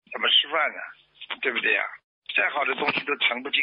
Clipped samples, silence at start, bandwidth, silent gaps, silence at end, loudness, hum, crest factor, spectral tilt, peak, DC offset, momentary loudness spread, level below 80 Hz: under 0.1%; 0.1 s; 5.4 kHz; 2.04-2.22 s; 0 s; -23 LUFS; none; 18 dB; 2.5 dB/octave; -8 dBFS; under 0.1%; 17 LU; -78 dBFS